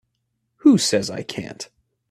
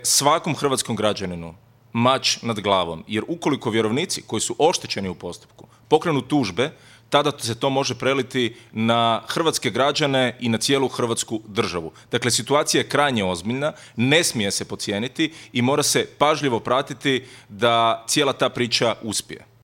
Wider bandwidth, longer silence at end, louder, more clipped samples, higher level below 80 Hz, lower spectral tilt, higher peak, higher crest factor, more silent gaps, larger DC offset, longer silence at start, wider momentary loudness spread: second, 14.5 kHz vs 17.5 kHz; first, 0.45 s vs 0.25 s; about the same, -19 LUFS vs -21 LUFS; neither; about the same, -62 dBFS vs -60 dBFS; about the same, -4.5 dB/octave vs -3.5 dB/octave; about the same, -4 dBFS vs -2 dBFS; about the same, 18 dB vs 20 dB; neither; neither; first, 0.65 s vs 0 s; first, 20 LU vs 8 LU